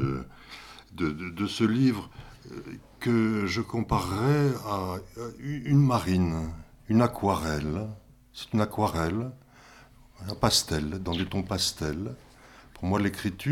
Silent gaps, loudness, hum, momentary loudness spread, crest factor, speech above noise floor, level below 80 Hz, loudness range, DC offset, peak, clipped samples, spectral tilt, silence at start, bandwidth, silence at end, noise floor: none; -28 LUFS; none; 20 LU; 22 dB; 26 dB; -48 dBFS; 3 LU; under 0.1%; -6 dBFS; under 0.1%; -5.5 dB/octave; 0 s; 16.5 kHz; 0 s; -53 dBFS